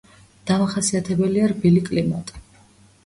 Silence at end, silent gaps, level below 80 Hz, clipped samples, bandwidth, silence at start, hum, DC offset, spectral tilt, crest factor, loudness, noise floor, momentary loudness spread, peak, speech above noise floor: 0.65 s; none; -50 dBFS; under 0.1%; 11.5 kHz; 0.45 s; none; under 0.1%; -6 dB/octave; 16 dB; -20 LUFS; -52 dBFS; 12 LU; -6 dBFS; 33 dB